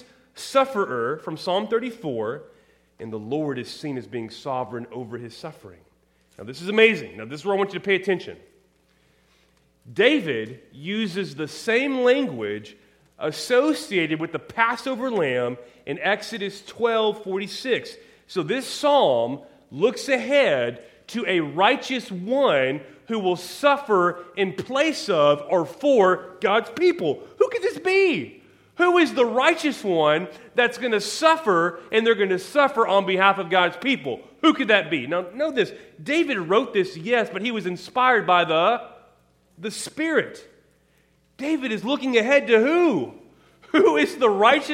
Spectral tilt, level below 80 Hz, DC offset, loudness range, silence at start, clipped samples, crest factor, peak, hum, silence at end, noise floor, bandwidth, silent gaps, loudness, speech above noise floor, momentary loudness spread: -4.5 dB/octave; -70 dBFS; under 0.1%; 6 LU; 0.35 s; under 0.1%; 22 dB; -2 dBFS; none; 0 s; -62 dBFS; 16 kHz; none; -22 LUFS; 40 dB; 14 LU